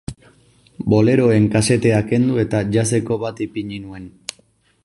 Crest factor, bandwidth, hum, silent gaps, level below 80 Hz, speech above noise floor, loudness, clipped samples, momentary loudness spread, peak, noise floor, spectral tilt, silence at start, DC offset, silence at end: 16 dB; 11.5 kHz; none; none; -46 dBFS; 41 dB; -17 LUFS; under 0.1%; 18 LU; -2 dBFS; -58 dBFS; -6 dB/octave; 0.1 s; under 0.1%; 0.75 s